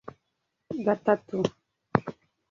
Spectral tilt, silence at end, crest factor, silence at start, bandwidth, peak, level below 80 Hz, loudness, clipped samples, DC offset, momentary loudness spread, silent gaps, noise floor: -7 dB/octave; 0.4 s; 28 dB; 0.05 s; 7.4 kHz; -2 dBFS; -64 dBFS; -29 LUFS; under 0.1%; under 0.1%; 15 LU; none; -80 dBFS